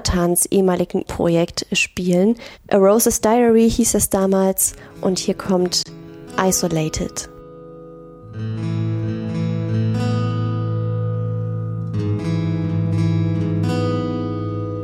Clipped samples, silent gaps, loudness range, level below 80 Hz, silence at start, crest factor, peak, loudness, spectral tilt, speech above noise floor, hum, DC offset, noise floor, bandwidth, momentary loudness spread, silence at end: under 0.1%; none; 7 LU; -40 dBFS; 0 s; 16 dB; -4 dBFS; -19 LUFS; -5 dB/octave; 21 dB; none; under 0.1%; -38 dBFS; 16 kHz; 12 LU; 0 s